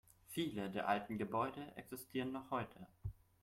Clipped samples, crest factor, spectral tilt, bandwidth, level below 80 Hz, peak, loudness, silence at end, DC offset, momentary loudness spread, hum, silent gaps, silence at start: under 0.1%; 20 dB; -5.5 dB/octave; 16.5 kHz; -66 dBFS; -24 dBFS; -43 LUFS; 0.3 s; under 0.1%; 12 LU; none; none; 0.3 s